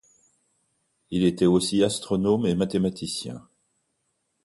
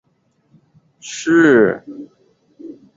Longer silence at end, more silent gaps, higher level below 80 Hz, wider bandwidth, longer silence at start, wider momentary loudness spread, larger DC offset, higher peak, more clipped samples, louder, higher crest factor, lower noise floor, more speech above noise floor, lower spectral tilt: first, 1.05 s vs 0.3 s; neither; first, -54 dBFS vs -60 dBFS; first, 11.5 kHz vs 7.8 kHz; about the same, 1.1 s vs 1.05 s; second, 11 LU vs 26 LU; neither; second, -8 dBFS vs -2 dBFS; neither; second, -24 LUFS vs -13 LUFS; about the same, 18 dB vs 18 dB; first, -75 dBFS vs -62 dBFS; first, 52 dB vs 48 dB; about the same, -5.5 dB/octave vs -5 dB/octave